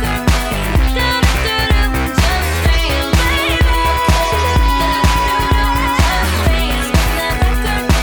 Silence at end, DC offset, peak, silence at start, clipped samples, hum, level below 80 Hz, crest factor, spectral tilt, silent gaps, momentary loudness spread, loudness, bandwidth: 0 s; under 0.1%; 0 dBFS; 0 s; under 0.1%; none; -16 dBFS; 14 dB; -4.5 dB/octave; none; 2 LU; -14 LUFS; over 20 kHz